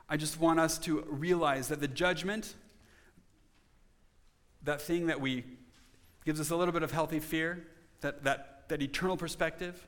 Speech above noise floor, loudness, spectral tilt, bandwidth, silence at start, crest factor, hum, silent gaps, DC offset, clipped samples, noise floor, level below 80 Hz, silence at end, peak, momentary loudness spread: 33 dB; -33 LUFS; -4.5 dB/octave; 19 kHz; 0.1 s; 22 dB; none; none; under 0.1%; under 0.1%; -65 dBFS; -56 dBFS; 0 s; -14 dBFS; 10 LU